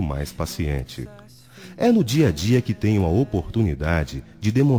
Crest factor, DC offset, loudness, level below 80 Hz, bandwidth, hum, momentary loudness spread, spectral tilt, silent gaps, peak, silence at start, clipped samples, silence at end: 14 dB; 0.1%; -22 LUFS; -38 dBFS; 18.5 kHz; none; 13 LU; -7 dB/octave; none; -6 dBFS; 0 s; under 0.1%; 0 s